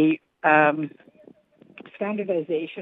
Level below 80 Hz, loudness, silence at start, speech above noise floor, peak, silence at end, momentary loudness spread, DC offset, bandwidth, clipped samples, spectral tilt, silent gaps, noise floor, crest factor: -82 dBFS; -23 LUFS; 0 s; 31 dB; -4 dBFS; 0 s; 13 LU; under 0.1%; 3.9 kHz; under 0.1%; -8.5 dB/octave; none; -53 dBFS; 20 dB